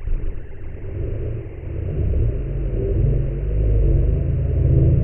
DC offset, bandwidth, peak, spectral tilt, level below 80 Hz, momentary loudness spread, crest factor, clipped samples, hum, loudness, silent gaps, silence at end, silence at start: under 0.1%; 3.1 kHz; -4 dBFS; -13 dB/octave; -22 dBFS; 13 LU; 16 dB; under 0.1%; none; -22 LUFS; none; 0 s; 0 s